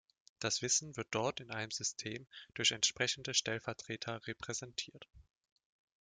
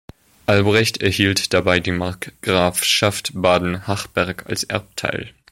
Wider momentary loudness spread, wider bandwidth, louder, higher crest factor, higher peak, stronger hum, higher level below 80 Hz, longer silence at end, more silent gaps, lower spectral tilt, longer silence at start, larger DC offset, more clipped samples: first, 12 LU vs 9 LU; second, 11 kHz vs 16.5 kHz; second, -36 LUFS vs -19 LUFS; first, 24 dB vs 18 dB; second, -16 dBFS vs -2 dBFS; neither; second, -74 dBFS vs -46 dBFS; first, 0.8 s vs 0.25 s; neither; second, -1.5 dB/octave vs -4 dB/octave; about the same, 0.4 s vs 0.5 s; neither; neither